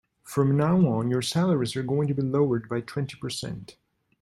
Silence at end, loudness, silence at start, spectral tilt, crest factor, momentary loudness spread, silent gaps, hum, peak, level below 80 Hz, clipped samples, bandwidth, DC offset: 0.5 s; -26 LUFS; 0.25 s; -6.5 dB/octave; 14 dB; 11 LU; none; none; -10 dBFS; -60 dBFS; under 0.1%; 13.5 kHz; under 0.1%